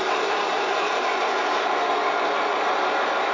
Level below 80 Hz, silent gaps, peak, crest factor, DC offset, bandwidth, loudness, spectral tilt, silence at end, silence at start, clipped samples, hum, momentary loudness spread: -78 dBFS; none; -10 dBFS; 12 dB; under 0.1%; 7.6 kHz; -23 LUFS; -1.5 dB/octave; 0 s; 0 s; under 0.1%; none; 1 LU